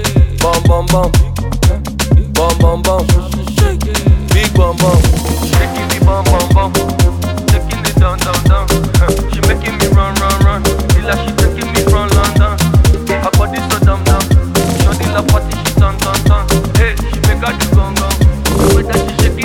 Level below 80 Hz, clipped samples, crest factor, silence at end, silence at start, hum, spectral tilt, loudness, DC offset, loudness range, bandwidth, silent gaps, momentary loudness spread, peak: -14 dBFS; under 0.1%; 10 dB; 0 s; 0 s; none; -5 dB/octave; -12 LUFS; 0.5%; 1 LU; 17.5 kHz; none; 3 LU; 0 dBFS